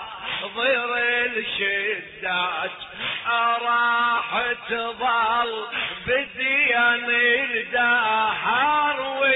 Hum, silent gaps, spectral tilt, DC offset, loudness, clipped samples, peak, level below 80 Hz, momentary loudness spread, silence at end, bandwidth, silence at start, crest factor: none; none; -5.5 dB/octave; under 0.1%; -21 LUFS; under 0.1%; -10 dBFS; -60 dBFS; 8 LU; 0 s; 4.1 kHz; 0 s; 14 dB